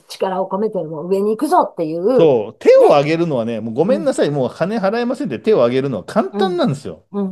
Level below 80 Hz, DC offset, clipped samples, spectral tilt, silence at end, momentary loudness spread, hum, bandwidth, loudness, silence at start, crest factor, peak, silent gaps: -66 dBFS; under 0.1%; under 0.1%; -6.5 dB/octave; 0 s; 9 LU; none; 12.5 kHz; -16 LUFS; 0.1 s; 16 dB; 0 dBFS; none